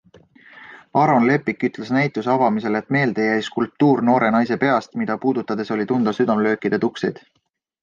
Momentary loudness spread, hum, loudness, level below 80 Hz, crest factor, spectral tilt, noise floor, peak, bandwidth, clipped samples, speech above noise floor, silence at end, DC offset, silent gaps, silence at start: 7 LU; none; -19 LUFS; -62 dBFS; 16 dB; -7.5 dB/octave; -50 dBFS; -4 dBFS; 7.4 kHz; under 0.1%; 31 dB; 0.7 s; under 0.1%; none; 0.55 s